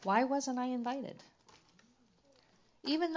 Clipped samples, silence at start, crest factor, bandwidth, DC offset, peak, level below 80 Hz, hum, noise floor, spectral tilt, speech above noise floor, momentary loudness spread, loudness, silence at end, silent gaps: under 0.1%; 0 s; 22 dB; 7.6 kHz; under 0.1%; -16 dBFS; -84 dBFS; none; -69 dBFS; -4 dB/octave; 35 dB; 15 LU; -36 LUFS; 0 s; none